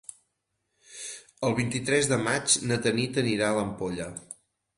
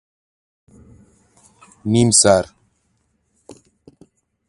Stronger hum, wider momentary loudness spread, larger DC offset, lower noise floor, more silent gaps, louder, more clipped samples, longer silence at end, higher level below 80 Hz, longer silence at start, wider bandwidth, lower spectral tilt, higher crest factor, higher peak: neither; about the same, 19 LU vs 19 LU; neither; first, -79 dBFS vs -66 dBFS; neither; second, -26 LUFS vs -14 LUFS; neither; second, 0.45 s vs 2.05 s; second, -58 dBFS vs -50 dBFS; second, 0.9 s vs 1.85 s; about the same, 11.5 kHz vs 11 kHz; about the same, -3.5 dB/octave vs -4 dB/octave; about the same, 20 dB vs 22 dB; second, -10 dBFS vs 0 dBFS